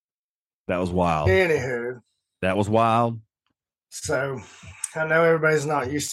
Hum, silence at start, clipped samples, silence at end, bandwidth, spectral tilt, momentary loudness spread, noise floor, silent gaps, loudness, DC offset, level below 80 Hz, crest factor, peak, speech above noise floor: none; 0.7 s; under 0.1%; 0 s; 12.5 kHz; -5 dB/octave; 17 LU; under -90 dBFS; none; -23 LUFS; under 0.1%; -50 dBFS; 18 dB; -6 dBFS; over 68 dB